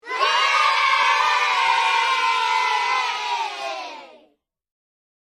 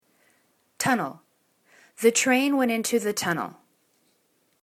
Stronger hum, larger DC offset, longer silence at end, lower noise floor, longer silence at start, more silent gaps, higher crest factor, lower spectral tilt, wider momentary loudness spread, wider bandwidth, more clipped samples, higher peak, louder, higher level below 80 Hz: neither; neither; about the same, 1.2 s vs 1.1 s; second, -62 dBFS vs -68 dBFS; second, 0.05 s vs 0.8 s; neither; about the same, 16 dB vs 20 dB; second, 2 dB/octave vs -3 dB/octave; about the same, 11 LU vs 9 LU; second, 14 kHz vs 19 kHz; neither; about the same, -6 dBFS vs -6 dBFS; first, -19 LUFS vs -24 LUFS; about the same, -68 dBFS vs -72 dBFS